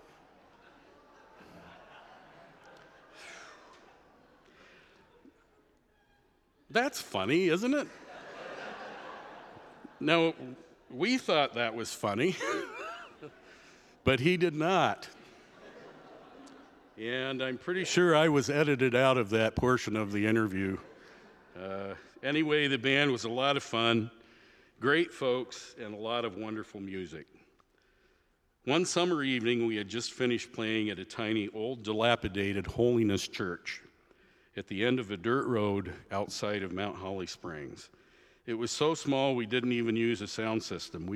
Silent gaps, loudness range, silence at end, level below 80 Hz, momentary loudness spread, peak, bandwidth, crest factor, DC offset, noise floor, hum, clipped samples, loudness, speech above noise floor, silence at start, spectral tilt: none; 7 LU; 0 s; -62 dBFS; 19 LU; -8 dBFS; 14 kHz; 24 dB; under 0.1%; -71 dBFS; none; under 0.1%; -31 LUFS; 41 dB; 1.4 s; -5 dB/octave